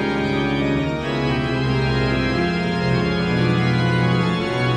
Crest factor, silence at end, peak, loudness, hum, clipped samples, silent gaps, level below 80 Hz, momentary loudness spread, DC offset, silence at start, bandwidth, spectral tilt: 12 dB; 0 s; -6 dBFS; -20 LUFS; none; under 0.1%; none; -36 dBFS; 3 LU; under 0.1%; 0 s; 9.6 kHz; -7 dB/octave